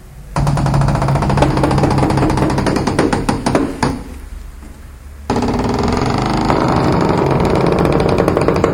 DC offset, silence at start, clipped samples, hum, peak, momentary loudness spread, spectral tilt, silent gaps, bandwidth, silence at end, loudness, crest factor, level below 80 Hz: under 0.1%; 0.05 s; under 0.1%; none; 0 dBFS; 8 LU; -7 dB/octave; none; 16 kHz; 0 s; -15 LUFS; 14 dB; -26 dBFS